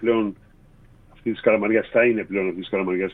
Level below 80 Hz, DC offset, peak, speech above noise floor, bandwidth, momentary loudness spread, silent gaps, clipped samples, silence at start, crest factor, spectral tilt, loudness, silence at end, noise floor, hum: -54 dBFS; under 0.1%; -6 dBFS; 30 dB; 4 kHz; 10 LU; none; under 0.1%; 0 s; 18 dB; -9 dB/octave; -22 LUFS; 0 s; -51 dBFS; none